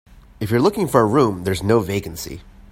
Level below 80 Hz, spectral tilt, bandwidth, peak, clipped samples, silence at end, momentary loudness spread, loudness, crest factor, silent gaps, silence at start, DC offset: -44 dBFS; -6.5 dB/octave; 16.5 kHz; 0 dBFS; under 0.1%; 0.1 s; 15 LU; -18 LUFS; 18 dB; none; 0.4 s; under 0.1%